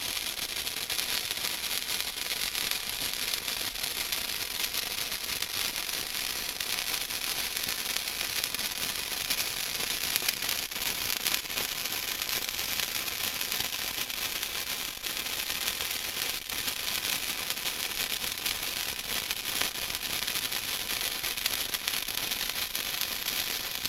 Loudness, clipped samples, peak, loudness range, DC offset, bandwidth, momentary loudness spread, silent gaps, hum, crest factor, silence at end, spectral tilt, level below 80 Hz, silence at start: -30 LUFS; under 0.1%; 0 dBFS; 1 LU; under 0.1%; 16.5 kHz; 2 LU; none; none; 32 dB; 0 s; 0.5 dB/octave; -56 dBFS; 0 s